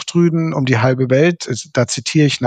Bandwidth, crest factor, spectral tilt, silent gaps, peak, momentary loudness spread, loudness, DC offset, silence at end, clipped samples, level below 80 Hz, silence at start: 9.4 kHz; 14 dB; -5.5 dB/octave; none; 0 dBFS; 5 LU; -16 LUFS; under 0.1%; 0 s; under 0.1%; -58 dBFS; 0 s